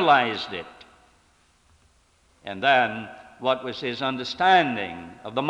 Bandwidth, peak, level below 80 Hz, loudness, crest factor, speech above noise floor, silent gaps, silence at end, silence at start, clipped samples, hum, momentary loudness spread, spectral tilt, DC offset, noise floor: 9.4 kHz; -4 dBFS; -64 dBFS; -23 LUFS; 20 dB; 38 dB; none; 0 s; 0 s; under 0.1%; none; 19 LU; -5 dB/octave; under 0.1%; -62 dBFS